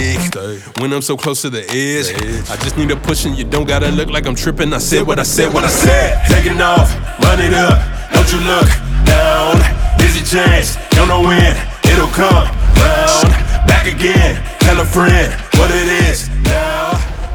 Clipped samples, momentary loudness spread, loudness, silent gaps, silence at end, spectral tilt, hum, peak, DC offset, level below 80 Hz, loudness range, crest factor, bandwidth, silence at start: under 0.1%; 7 LU; -12 LUFS; none; 0 s; -4.5 dB/octave; none; 0 dBFS; under 0.1%; -16 dBFS; 5 LU; 12 dB; over 20 kHz; 0 s